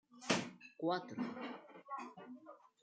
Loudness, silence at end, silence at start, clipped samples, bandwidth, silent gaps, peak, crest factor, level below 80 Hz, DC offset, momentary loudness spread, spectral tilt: -42 LUFS; 0.25 s; 0.1 s; under 0.1%; 9 kHz; none; -20 dBFS; 24 dB; -84 dBFS; under 0.1%; 17 LU; -4 dB/octave